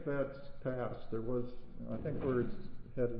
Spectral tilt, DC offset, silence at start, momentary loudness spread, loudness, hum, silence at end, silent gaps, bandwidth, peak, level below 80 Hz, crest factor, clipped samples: -8 dB/octave; under 0.1%; 0 s; 12 LU; -40 LUFS; none; 0 s; none; 5 kHz; -22 dBFS; -50 dBFS; 14 dB; under 0.1%